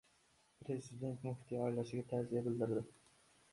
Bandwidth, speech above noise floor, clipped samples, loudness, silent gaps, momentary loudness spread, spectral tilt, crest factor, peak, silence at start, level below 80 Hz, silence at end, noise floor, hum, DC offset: 11.5 kHz; 33 dB; under 0.1%; -42 LUFS; none; 7 LU; -8 dB/octave; 18 dB; -26 dBFS; 0.6 s; -74 dBFS; 0.6 s; -74 dBFS; none; under 0.1%